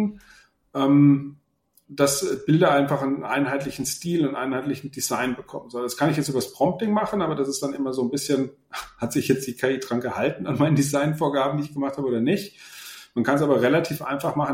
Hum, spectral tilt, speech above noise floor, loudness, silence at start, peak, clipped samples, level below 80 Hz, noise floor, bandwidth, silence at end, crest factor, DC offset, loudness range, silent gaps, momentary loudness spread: none; -5.5 dB/octave; 34 dB; -23 LUFS; 0 s; -4 dBFS; under 0.1%; -60 dBFS; -57 dBFS; 16.5 kHz; 0 s; 18 dB; under 0.1%; 4 LU; none; 12 LU